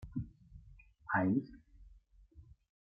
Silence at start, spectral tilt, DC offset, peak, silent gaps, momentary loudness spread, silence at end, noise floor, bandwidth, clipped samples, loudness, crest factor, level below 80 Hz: 0 s; -10.5 dB/octave; under 0.1%; -20 dBFS; none; 27 LU; 0.4 s; -63 dBFS; 5 kHz; under 0.1%; -36 LUFS; 20 dB; -60 dBFS